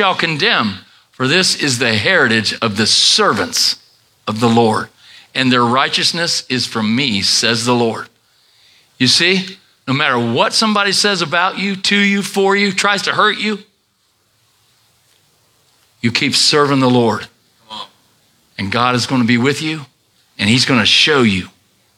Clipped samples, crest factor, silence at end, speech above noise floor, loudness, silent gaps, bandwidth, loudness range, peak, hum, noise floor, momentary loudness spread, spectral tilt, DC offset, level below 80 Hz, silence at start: under 0.1%; 16 dB; 0.5 s; 47 dB; -13 LUFS; none; 15.5 kHz; 5 LU; 0 dBFS; none; -61 dBFS; 14 LU; -3.5 dB/octave; under 0.1%; -62 dBFS; 0 s